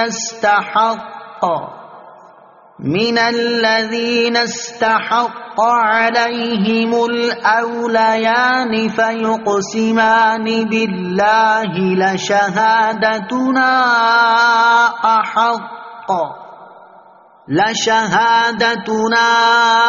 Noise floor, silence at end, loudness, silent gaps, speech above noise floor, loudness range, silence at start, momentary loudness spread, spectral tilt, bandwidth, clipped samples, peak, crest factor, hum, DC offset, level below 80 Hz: -45 dBFS; 0 s; -14 LUFS; none; 30 dB; 5 LU; 0 s; 8 LU; -2 dB/octave; 7.4 kHz; under 0.1%; 0 dBFS; 14 dB; none; under 0.1%; -60 dBFS